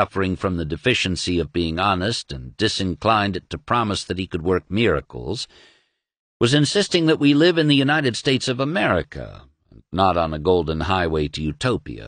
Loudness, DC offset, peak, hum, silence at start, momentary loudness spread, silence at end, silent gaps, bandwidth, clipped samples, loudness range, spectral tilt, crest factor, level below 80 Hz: -20 LUFS; under 0.1%; -2 dBFS; none; 0 s; 11 LU; 0 s; 6.19-6.40 s; 10 kHz; under 0.1%; 4 LU; -5 dB/octave; 18 dB; -42 dBFS